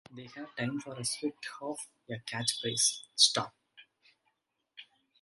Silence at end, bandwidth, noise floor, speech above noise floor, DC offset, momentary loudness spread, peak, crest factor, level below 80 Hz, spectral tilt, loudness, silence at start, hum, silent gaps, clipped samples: 0.4 s; 12 kHz; -80 dBFS; 46 dB; under 0.1%; 18 LU; -8 dBFS; 28 dB; -76 dBFS; -1.5 dB/octave; -31 LUFS; 0.1 s; none; none; under 0.1%